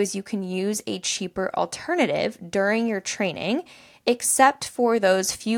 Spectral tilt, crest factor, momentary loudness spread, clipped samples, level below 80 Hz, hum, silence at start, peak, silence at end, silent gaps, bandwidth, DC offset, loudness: -3 dB/octave; 20 dB; 8 LU; under 0.1%; -62 dBFS; none; 0 s; -4 dBFS; 0 s; none; 18 kHz; under 0.1%; -23 LUFS